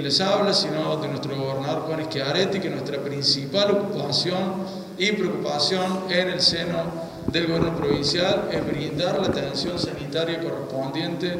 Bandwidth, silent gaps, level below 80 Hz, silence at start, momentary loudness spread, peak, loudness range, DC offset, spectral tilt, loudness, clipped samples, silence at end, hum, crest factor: 16 kHz; none; -52 dBFS; 0 s; 8 LU; -6 dBFS; 2 LU; under 0.1%; -4.5 dB/octave; -23 LUFS; under 0.1%; 0 s; none; 18 dB